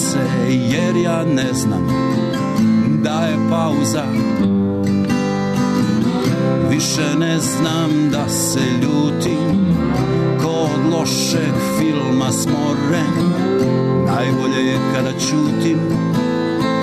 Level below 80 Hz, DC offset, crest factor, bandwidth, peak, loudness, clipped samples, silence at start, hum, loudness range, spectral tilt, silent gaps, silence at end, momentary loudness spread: -44 dBFS; under 0.1%; 10 dB; 13.5 kHz; -6 dBFS; -17 LUFS; under 0.1%; 0 s; none; 0 LU; -5.5 dB/octave; none; 0 s; 2 LU